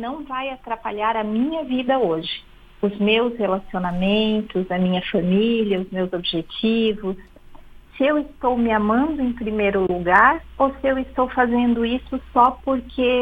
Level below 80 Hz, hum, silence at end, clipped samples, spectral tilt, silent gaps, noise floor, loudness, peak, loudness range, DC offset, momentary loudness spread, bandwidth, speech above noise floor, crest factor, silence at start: -44 dBFS; none; 0 s; under 0.1%; -8 dB/octave; none; -42 dBFS; -21 LUFS; 0 dBFS; 3 LU; under 0.1%; 9 LU; 5 kHz; 21 dB; 20 dB; 0 s